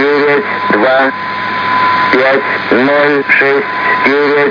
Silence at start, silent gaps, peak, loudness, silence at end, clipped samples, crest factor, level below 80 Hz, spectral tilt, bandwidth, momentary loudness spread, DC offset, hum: 0 s; none; 0 dBFS; -10 LUFS; 0 s; 0.2%; 10 dB; -58 dBFS; -6 dB/octave; 5.4 kHz; 4 LU; under 0.1%; none